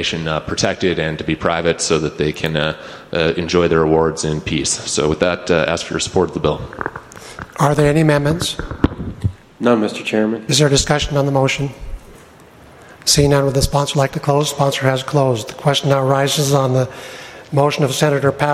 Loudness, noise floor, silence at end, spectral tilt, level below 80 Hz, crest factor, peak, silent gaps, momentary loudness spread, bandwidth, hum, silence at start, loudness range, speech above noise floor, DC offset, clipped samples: -17 LUFS; -43 dBFS; 0 s; -4.5 dB/octave; -36 dBFS; 16 dB; 0 dBFS; none; 11 LU; 15.5 kHz; none; 0 s; 2 LU; 26 dB; under 0.1%; under 0.1%